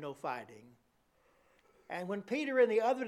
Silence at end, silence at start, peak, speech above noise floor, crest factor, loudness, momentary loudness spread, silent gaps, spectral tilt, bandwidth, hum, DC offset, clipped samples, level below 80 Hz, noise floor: 0 s; 0 s; -18 dBFS; 38 dB; 18 dB; -34 LUFS; 16 LU; none; -5.5 dB/octave; 12.5 kHz; none; under 0.1%; under 0.1%; -82 dBFS; -72 dBFS